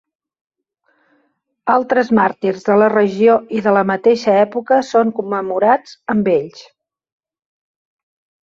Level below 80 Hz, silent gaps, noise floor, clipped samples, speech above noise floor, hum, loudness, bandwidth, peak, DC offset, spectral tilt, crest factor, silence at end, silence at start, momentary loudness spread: -60 dBFS; none; -64 dBFS; under 0.1%; 50 dB; none; -15 LUFS; 7.6 kHz; -2 dBFS; under 0.1%; -6.5 dB/octave; 16 dB; 1.85 s; 1.65 s; 7 LU